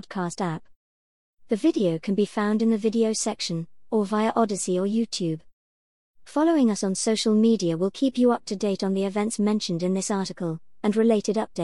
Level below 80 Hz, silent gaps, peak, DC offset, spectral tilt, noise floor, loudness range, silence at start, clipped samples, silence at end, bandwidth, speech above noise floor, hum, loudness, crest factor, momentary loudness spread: -66 dBFS; 0.76-1.34 s, 5.53-6.14 s; -8 dBFS; 0.3%; -5 dB/octave; under -90 dBFS; 3 LU; 0.1 s; under 0.1%; 0 s; 12 kHz; over 67 dB; none; -24 LUFS; 16 dB; 9 LU